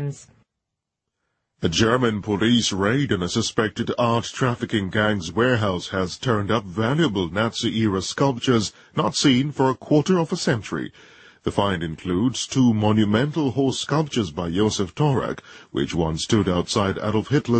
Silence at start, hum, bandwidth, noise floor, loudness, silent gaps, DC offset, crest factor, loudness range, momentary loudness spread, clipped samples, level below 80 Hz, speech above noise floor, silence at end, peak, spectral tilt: 0 s; none; 8.8 kHz; -82 dBFS; -22 LUFS; none; under 0.1%; 18 dB; 2 LU; 7 LU; under 0.1%; -48 dBFS; 61 dB; 0 s; -4 dBFS; -5 dB/octave